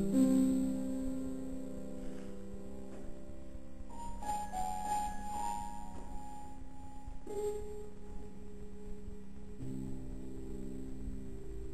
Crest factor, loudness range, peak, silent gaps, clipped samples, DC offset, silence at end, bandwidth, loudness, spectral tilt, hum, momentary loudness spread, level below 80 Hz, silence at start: 20 dB; 7 LU; -20 dBFS; none; under 0.1%; 0.8%; 0 s; 13.5 kHz; -40 LUFS; -6.5 dB/octave; none; 15 LU; -50 dBFS; 0 s